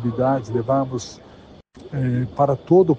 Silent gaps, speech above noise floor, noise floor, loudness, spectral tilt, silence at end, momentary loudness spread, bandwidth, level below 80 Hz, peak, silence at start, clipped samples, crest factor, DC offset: none; 26 dB; -45 dBFS; -21 LUFS; -8 dB/octave; 0 s; 14 LU; 7.8 kHz; -50 dBFS; -4 dBFS; 0 s; under 0.1%; 16 dB; under 0.1%